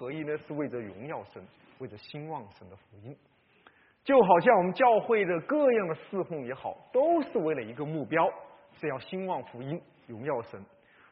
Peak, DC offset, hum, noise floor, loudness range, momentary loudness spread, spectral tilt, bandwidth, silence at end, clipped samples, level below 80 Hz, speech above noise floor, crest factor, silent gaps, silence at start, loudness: -8 dBFS; under 0.1%; none; -62 dBFS; 14 LU; 22 LU; -5 dB/octave; 5.4 kHz; 0.45 s; under 0.1%; -74 dBFS; 33 dB; 22 dB; none; 0 s; -28 LUFS